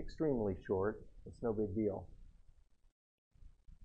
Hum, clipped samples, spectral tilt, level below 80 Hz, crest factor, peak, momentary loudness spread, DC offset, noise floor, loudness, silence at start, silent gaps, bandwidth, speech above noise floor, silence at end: none; under 0.1%; -9.5 dB/octave; -56 dBFS; 16 dB; -24 dBFS; 16 LU; under 0.1%; -64 dBFS; -39 LUFS; 0 s; 2.92-3.31 s; 8.4 kHz; 26 dB; 0 s